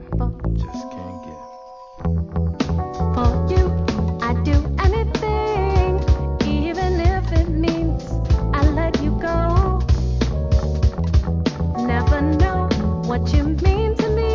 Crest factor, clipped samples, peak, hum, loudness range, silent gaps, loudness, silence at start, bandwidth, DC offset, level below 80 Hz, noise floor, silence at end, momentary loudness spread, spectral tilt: 14 dB; under 0.1%; -4 dBFS; none; 3 LU; none; -20 LUFS; 0 s; 7.2 kHz; under 0.1%; -22 dBFS; -39 dBFS; 0 s; 7 LU; -7.5 dB/octave